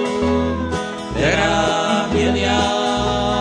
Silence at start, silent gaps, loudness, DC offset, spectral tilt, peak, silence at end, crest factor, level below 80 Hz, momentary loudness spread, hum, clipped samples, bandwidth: 0 s; none; -18 LUFS; under 0.1%; -4.5 dB/octave; -4 dBFS; 0 s; 14 dB; -32 dBFS; 6 LU; none; under 0.1%; 10.5 kHz